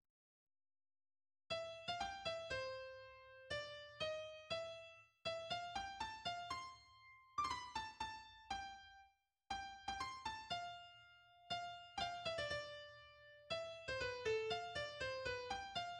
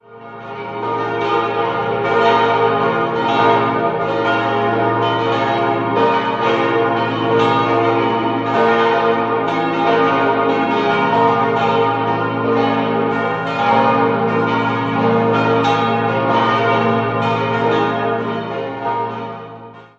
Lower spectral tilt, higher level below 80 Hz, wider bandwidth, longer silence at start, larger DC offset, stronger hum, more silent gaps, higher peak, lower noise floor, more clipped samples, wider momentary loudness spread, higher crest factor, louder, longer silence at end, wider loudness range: second, -2.5 dB/octave vs -7 dB/octave; second, -70 dBFS vs -54 dBFS; first, 11.5 kHz vs 7.4 kHz; first, 1.5 s vs 0.1 s; neither; neither; neither; second, -30 dBFS vs -2 dBFS; first, -73 dBFS vs -36 dBFS; neither; first, 16 LU vs 7 LU; about the same, 18 dB vs 14 dB; second, -47 LUFS vs -16 LUFS; second, 0 s vs 0.15 s; first, 4 LU vs 1 LU